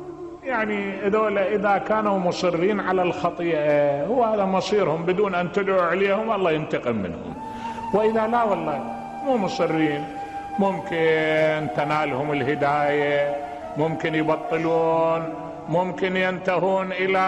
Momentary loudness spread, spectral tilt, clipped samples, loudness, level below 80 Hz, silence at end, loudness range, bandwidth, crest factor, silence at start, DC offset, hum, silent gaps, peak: 9 LU; -6.5 dB/octave; under 0.1%; -23 LUFS; -56 dBFS; 0 s; 2 LU; 11 kHz; 14 dB; 0 s; under 0.1%; none; none; -8 dBFS